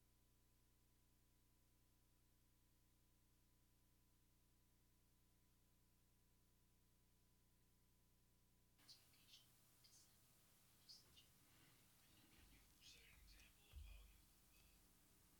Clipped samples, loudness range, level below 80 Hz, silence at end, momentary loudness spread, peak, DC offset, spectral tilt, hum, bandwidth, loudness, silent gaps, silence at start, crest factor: under 0.1%; 1 LU; -76 dBFS; 0 s; 4 LU; -52 dBFS; under 0.1%; -2.5 dB/octave; 60 Hz at -85 dBFS; 19 kHz; -67 LUFS; none; 0 s; 22 dB